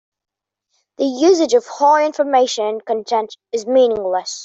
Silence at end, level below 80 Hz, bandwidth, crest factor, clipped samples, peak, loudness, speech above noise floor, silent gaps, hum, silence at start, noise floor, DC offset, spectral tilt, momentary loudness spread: 0 s; -62 dBFS; 8 kHz; 14 dB; under 0.1%; -2 dBFS; -16 LUFS; 56 dB; none; none; 1 s; -71 dBFS; under 0.1%; -2.5 dB/octave; 9 LU